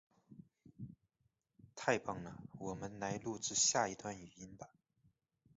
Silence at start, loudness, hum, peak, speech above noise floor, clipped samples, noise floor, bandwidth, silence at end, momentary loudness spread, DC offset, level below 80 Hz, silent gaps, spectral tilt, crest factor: 0.3 s; -38 LUFS; none; -18 dBFS; 43 dB; under 0.1%; -83 dBFS; 7.6 kHz; 0.9 s; 22 LU; under 0.1%; -72 dBFS; none; -3 dB/octave; 26 dB